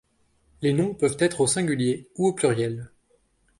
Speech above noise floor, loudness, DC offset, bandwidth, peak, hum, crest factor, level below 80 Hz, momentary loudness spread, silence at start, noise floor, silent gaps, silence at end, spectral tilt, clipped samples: 42 dB; -24 LUFS; under 0.1%; 11.5 kHz; -8 dBFS; none; 18 dB; -60 dBFS; 6 LU; 0.6 s; -65 dBFS; none; 0.75 s; -5 dB/octave; under 0.1%